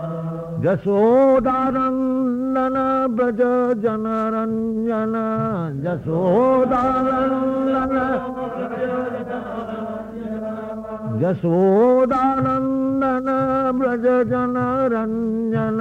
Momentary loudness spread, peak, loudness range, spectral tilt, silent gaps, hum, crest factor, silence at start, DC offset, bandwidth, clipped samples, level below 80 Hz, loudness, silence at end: 12 LU; -8 dBFS; 5 LU; -9.5 dB/octave; none; none; 12 dB; 0 s; under 0.1%; 7.2 kHz; under 0.1%; -48 dBFS; -20 LUFS; 0 s